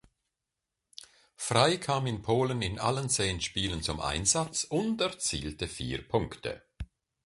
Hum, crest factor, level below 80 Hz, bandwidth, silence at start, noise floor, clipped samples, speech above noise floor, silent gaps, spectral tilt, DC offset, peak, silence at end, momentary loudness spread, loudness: none; 24 dB; -48 dBFS; 11.5 kHz; 1 s; -87 dBFS; under 0.1%; 57 dB; none; -3.5 dB/octave; under 0.1%; -8 dBFS; 0.4 s; 20 LU; -30 LUFS